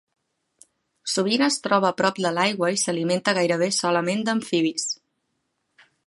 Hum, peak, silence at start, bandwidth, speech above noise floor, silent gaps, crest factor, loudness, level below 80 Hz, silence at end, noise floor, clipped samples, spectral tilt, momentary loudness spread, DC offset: none; -6 dBFS; 1.05 s; 11.5 kHz; 53 dB; none; 20 dB; -22 LUFS; -74 dBFS; 1.1 s; -75 dBFS; under 0.1%; -3.5 dB/octave; 6 LU; under 0.1%